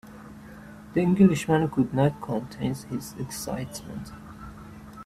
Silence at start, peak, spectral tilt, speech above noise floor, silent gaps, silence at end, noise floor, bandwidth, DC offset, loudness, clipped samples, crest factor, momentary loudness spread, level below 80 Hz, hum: 0.05 s; -6 dBFS; -7 dB/octave; 19 dB; none; 0 s; -44 dBFS; 15 kHz; under 0.1%; -26 LUFS; under 0.1%; 20 dB; 25 LU; -52 dBFS; none